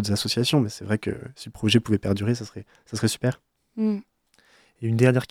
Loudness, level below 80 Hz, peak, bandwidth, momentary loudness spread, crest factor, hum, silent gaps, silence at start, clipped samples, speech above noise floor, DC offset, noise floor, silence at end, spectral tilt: -24 LUFS; -56 dBFS; -4 dBFS; 16 kHz; 17 LU; 20 dB; none; none; 0 s; under 0.1%; 37 dB; under 0.1%; -60 dBFS; 0.05 s; -5.5 dB/octave